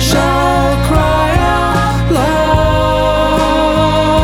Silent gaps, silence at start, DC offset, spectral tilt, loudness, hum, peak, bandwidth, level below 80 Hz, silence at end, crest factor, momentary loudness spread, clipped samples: none; 0 s; under 0.1%; -5.5 dB/octave; -12 LUFS; none; 0 dBFS; 17 kHz; -20 dBFS; 0 s; 10 dB; 1 LU; under 0.1%